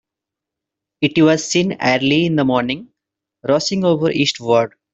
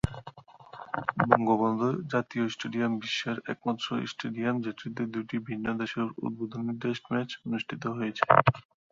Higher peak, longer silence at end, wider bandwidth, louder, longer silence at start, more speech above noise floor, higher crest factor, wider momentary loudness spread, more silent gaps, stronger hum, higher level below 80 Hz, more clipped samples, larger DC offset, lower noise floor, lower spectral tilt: about the same, -2 dBFS vs -2 dBFS; about the same, 0.25 s vs 0.3 s; about the same, 8.2 kHz vs 7.6 kHz; first, -16 LUFS vs -30 LUFS; first, 1 s vs 0.05 s; first, 68 dB vs 21 dB; second, 16 dB vs 28 dB; second, 6 LU vs 12 LU; neither; neither; about the same, -56 dBFS vs -56 dBFS; neither; neither; first, -84 dBFS vs -50 dBFS; second, -5 dB/octave vs -6.5 dB/octave